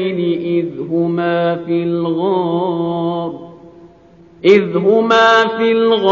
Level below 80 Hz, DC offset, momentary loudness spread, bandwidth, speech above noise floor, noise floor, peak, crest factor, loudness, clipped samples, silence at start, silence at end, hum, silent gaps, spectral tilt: -58 dBFS; under 0.1%; 9 LU; 7.2 kHz; 30 dB; -44 dBFS; 0 dBFS; 14 dB; -15 LUFS; under 0.1%; 0 s; 0 s; none; none; -4 dB/octave